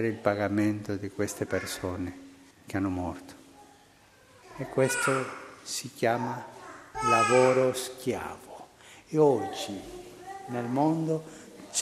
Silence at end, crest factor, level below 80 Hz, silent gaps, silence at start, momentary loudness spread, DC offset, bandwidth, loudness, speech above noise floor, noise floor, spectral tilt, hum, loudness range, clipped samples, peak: 0 s; 22 dB; -62 dBFS; none; 0 s; 21 LU; under 0.1%; 15 kHz; -29 LUFS; 30 dB; -58 dBFS; -4.5 dB/octave; none; 8 LU; under 0.1%; -8 dBFS